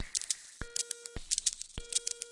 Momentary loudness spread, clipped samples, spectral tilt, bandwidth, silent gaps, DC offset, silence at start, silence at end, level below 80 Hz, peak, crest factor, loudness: 8 LU; under 0.1%; 0 dB/octave; 11.5 kHz; none; under 0.1%; 0 s; 0 s; -52 dBFS; -12 dBFS; 26 dB; -35 LUFS